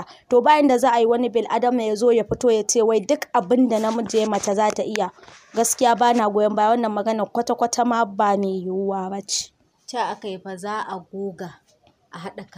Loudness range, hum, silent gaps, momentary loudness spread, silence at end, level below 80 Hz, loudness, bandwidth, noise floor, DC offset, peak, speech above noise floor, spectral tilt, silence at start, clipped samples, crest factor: 9 LU; none; none; 14 LU; 0.15 s; -58 dBFS; -20 LUFS; 15.5 kHz; -59 dBFS; under 0.1%; -4 dBFS; 39 dB; -4 dB/octave; 0 s; under 0.1%; 16 dB